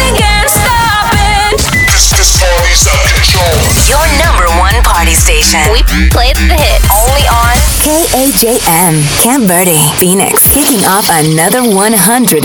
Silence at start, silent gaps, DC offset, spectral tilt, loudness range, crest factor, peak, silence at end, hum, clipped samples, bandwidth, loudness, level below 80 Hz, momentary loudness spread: 0 s; none; under 0.1%; -3 dB/octave; 1 LU; 6 dB; 0 dBFS; 0 s; none; 0.3%; over 20 kHz; -6 LUFS; -12 dBFS; 3 LU